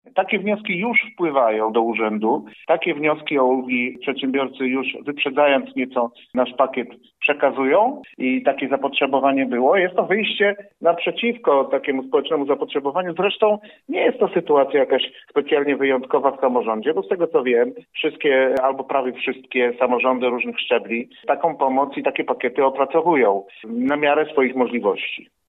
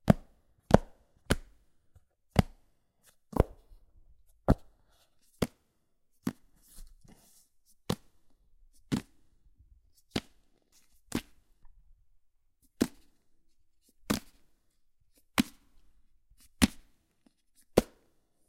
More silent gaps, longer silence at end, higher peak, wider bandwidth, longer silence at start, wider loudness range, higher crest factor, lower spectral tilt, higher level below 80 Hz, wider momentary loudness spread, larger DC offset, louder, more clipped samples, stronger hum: neither; second, 0.3 s vs 0.65 s; second, -4 dBFS vs 0 dBFS; second, 4.1 kHz vs 16 kHz; about the same, 0.15 s vs 0.05 s; second, 2 LU vs 10 LU; second, 16 dB vs 36 dB; first, -7.5 dB/octave vs -5.5 dB/octave; second, -72 dBFS vs -46 dBFS; second, 6 LU vs 12 LU; neither; first, -20 LUFS vs -33 LUFS; neither; neither